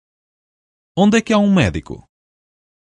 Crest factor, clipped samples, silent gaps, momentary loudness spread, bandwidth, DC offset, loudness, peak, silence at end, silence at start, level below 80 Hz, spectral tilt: 18 dB; under 0.1%; none; 20 LU; 10.5 kHz; under 0.1%; -15 LUFS; 0 dBFS; 0.85 s; 0.95 s; -40 dBFS; -6 dB/octave